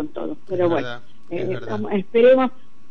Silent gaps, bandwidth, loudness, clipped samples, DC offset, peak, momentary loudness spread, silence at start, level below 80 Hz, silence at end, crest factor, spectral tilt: none; 6.2 kHz; -20 LUFS; under 0.1%; 3%; -4 dBFS; 17 LU; 0 s; -64 dBFS; 0.4 s; 16 dB; -8 dB/octave